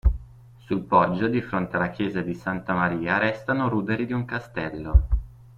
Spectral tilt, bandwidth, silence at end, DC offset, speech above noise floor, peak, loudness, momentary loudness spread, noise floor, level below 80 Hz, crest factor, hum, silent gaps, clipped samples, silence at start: -8.5 dB/octave; 6.8 kHz; 0.25 s; under 0.1%; 23 dB; -4 dBFS; -25 LUFS; 9 LU; -47 dBFS; -30 dBFS; 20 dB; none; none; under 0.1%; 0.05 s